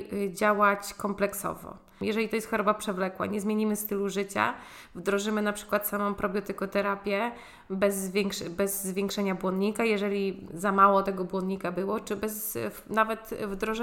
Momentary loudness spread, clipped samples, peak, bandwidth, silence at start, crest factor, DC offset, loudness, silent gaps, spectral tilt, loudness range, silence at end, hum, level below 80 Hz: 9 LU; under 0.1%; -8 dBFS; 17 kHz; 0 s; 20 dB; under 0.1%; -29 LUFS; none; -4.5 dB/octave; 3 LU; 0 s; none; -58 dBFS